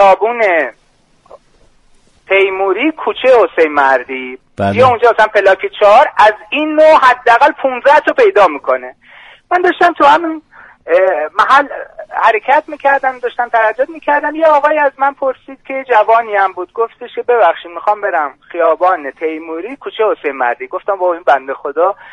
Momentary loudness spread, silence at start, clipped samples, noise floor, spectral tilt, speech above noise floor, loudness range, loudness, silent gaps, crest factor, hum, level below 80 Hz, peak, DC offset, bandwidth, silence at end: 12 LU; 0 s; under 0.1%; -51 dBFS; -5 dB/octave; 39 dB; 6 LU; -11 LUFS; none; 12 dB; none; -52 dBFS; 0 dBFS; under 0.1%; 10.5 kHz; 0.2 s